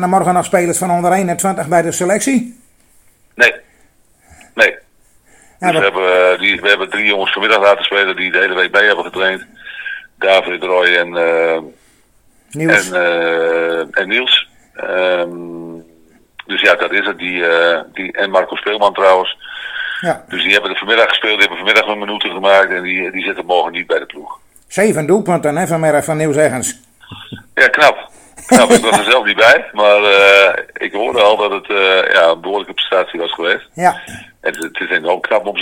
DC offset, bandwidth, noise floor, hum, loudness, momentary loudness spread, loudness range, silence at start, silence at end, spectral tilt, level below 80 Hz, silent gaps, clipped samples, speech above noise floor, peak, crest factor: under 0.1%; 20 kHz; -51 dBFS; none; -13 LUFS; 12 LU; 6 LU; 0 s; 0 s; -3 dB/octave; -54 dBFS; none; 0.3%; 38 dB; 0 dBFS; 14 dB